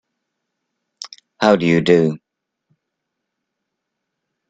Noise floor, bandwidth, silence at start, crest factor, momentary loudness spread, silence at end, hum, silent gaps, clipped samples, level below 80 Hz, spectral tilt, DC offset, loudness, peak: -78 dBFS; 9.2 kHz; 1 s; 22 dB; 21 LU; 2.35 s; none; none; under 0.1%; -60 dBFS; -6.5 dB/octave; under 0.1%; -15 LUFS; 0 dBFS